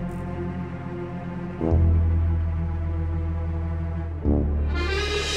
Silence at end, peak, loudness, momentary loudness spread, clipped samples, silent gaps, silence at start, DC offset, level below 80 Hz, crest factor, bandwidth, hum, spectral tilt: 0 s; -10 dBFS; -26 LUFS; 11 LU; under 0.1%; none; 0 s; 0.3%; -28 dBFS; 14 dB; 9.2 kHz; none; -6.5 dB/octave